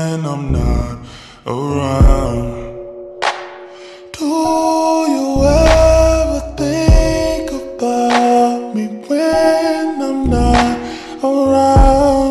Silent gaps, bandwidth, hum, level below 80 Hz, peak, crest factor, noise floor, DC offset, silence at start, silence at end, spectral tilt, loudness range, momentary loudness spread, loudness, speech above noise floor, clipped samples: none; 13 kHz; none; -20 dBFS; 0 dBFS; 14 dB; -35 dBFS; under 0.1%; 0 s; 0 s; -6 dB/octave; 5 LU; 18 LU; -14 LUFS; 20 dB; under 0.1%